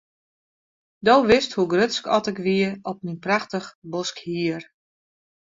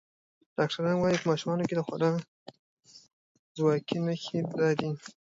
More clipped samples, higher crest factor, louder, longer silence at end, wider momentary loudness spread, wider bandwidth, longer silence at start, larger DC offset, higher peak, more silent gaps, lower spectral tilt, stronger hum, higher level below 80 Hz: neither; about the same, 20 dB vs 20 dB; first, -22 LUFS vs -29 LUFS; first, 0.95 s vs 0.1 s; first, 14 LU vs 9 LU; about the same, 7.8 kHz vs 7.8 kHz; first, 1.05 s vs 0.6 s; neither; first, -4 dBFS vs -12 dBFS; second, 3.75-3.82 s vs 2.28-2.46 s, 2.59-2.77 s, 3.13-3.55 s; second, -5 dB/octave vs -6.5 dB/octave; neither; first, -58 dBFS vs -68 dBFS